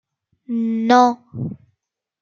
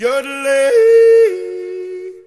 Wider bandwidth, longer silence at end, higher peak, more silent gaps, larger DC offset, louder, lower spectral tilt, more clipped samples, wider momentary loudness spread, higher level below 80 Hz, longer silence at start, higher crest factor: second, 7.2 kHz vs 12.5 kHz; first, 0.65 s vs 0.05 s; about the same, -2 dBFS vs -2 dBFS; neither; neither; second, -17 LUFS vs -11 LUFS; first, -6 dB/octave vs -2 dB/octave; neither; about the same, 16 LU vs 17 LU; about the same, -62 dBFS vs -66 dBFS; first, 0.5 s vs 0 s; first, 18 dB vs 10 dB